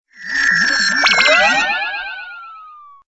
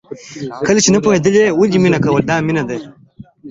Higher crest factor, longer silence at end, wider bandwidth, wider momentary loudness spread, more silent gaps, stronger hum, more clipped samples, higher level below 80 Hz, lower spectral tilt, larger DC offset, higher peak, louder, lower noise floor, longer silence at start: about the same, 16 dB vs 14 dB; first, 0.3 s vs 0 s; about the same, 8 kHz vs 8 kHz; first, 19 LU vs 16 LU; neither; first, 60 Hz at -60 dBFS vs none; neither; about the same, -50 dBFS vs -48 dBFS; second, -0.5 dB/octave vs -5 dB/octave; neither; about the same, 0 dBFS vs 0 dBFS; about the same, -13 LUFS vs -13 LUFS; about the same, -39 dBFS vs -37 dBFS; about the same, 0.2 s vs 0.1 s